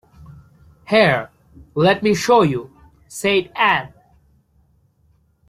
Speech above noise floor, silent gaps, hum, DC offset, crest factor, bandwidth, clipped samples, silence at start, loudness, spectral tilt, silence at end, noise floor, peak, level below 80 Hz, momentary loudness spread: 43 dB; none; none; under 0.1%; 18 dB; 15.5 kHz; under 0.1%; 0.3 s; -17 LUFS; -5 dB/octave; 1.6 s; -59 dBFS; -2 dBFS; -52 dBFS; 15 LU